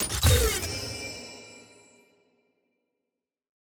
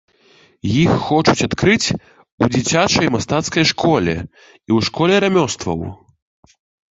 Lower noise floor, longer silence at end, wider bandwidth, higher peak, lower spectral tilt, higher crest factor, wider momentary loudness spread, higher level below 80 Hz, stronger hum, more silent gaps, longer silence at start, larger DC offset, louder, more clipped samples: first, -87 dBFS vs -52 dBFS; first, 2.05 s vs 1 s; first, over 20 kHz vs 8.2 kHz; second, -12 dBFS vs 0 dBFS; about the same, -3.5 dB/octave vs -4.5 dB/octave; about the same, 20 dB vs 18 dB; first, 22 LU vs 11 LU; about the same, -38 dBFS vs -42 dBFS; neither; second, none vs 2.32-2.38 s; second, 0 s vs 0.65 s; neither; second, -26 LUFS vs -16 LUFS; neither